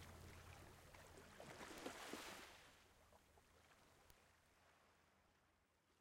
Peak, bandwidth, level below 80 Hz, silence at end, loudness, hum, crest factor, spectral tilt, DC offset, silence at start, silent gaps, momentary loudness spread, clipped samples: -36 dBFS; 16 kHz; -78 dBFS; 0 s; -58 LUFS; none; 26 dB; -3.5 dB/octave; under 0.1%; 0 s; none; 10 LU; under 0.1%